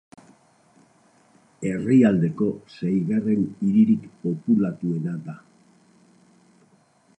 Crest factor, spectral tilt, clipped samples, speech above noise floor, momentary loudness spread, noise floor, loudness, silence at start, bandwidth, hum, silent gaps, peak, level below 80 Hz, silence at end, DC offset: 18 dB; -9 dB/octave; under 0.1%; 38 dB; 13 LU; -60 dBFS; -22 LUFS; 1.6 s; 9 kHz; none; none; -6 dBFS; -64 dBFS; 1.85 s; under 0.1%